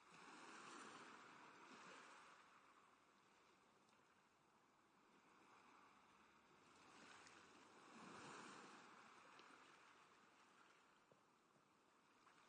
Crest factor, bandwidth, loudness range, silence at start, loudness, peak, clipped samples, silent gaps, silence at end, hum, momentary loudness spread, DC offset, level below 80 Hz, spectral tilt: 20 dB; 9.6 kHz; 6 LU; 0 s; -63 LUFS; -48 dBFS; under 0.1%; none; 0 s; none; 8 LU; under 0.1%; under -90 dBFS; -2.5 dB/octave